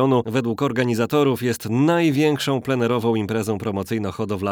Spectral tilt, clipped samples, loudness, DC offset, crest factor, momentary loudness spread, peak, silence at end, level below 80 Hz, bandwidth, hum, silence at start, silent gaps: -6.5 dB/octave; under 0.1%; -21 LUFS; under 0.1%; 14 dB; 7 LU; -6 dBFS; 0 s; -62 dBFS; over 20 kHz; none; 0 s; none